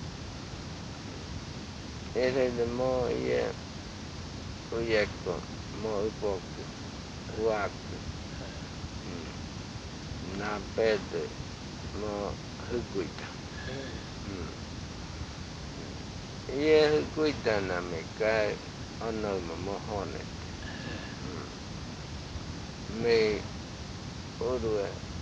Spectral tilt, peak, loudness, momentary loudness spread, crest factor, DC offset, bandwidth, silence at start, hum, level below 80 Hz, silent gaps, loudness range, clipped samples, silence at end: -5 dB/octave; -12 dBFS; -34 LUFS; 13 LU; 22 dB; under 0.1%; 9.6 kHz; 0 s; none; -48 dBFS; none; 9 LU; under 0.1%; 0 s